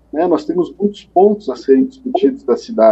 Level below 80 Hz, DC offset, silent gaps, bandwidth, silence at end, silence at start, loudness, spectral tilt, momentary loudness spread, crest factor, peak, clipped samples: -54 dBFS; under 0.1%; none; 8 kHz; 0 s; 0.15 s; -15 LUFS; -7.5 dB/octave; 7 LU; 14 dB; 0 dBFS; under 0.1%